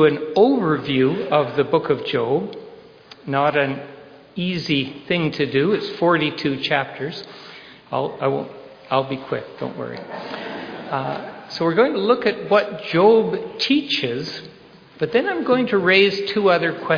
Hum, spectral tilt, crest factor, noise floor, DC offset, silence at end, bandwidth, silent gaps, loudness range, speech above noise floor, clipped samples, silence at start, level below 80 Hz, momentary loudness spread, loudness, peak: none; -6.5 dB/octave; 18 dB; -44 dBFS; under 0.1%; 0 s; 5.4 kHz; none; 7 LU; 25 dB; under 0.1%; 0 s; -62 dBFS; 15 LU; -20 LUFS; -2 dBFS